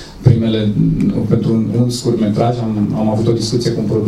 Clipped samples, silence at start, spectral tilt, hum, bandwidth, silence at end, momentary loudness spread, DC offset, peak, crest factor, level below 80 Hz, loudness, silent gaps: under 0.1%; 0 s; -7.5 dB/octave; none; 13 kHz; 0 s; 3 LU; under 0.1%; 0 dBFS; 14 dB; -36 dBFS; -15 LUFS; none